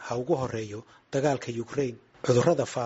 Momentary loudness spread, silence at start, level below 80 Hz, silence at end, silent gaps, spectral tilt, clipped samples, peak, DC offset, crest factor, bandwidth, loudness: 12 LU; 0 s; -60 dBFS; 0 s; none; -6 dB/octave; under 0.1%; -8 dBFS; under 0.1%; 20 dB; 8 kHz; -28 LUFS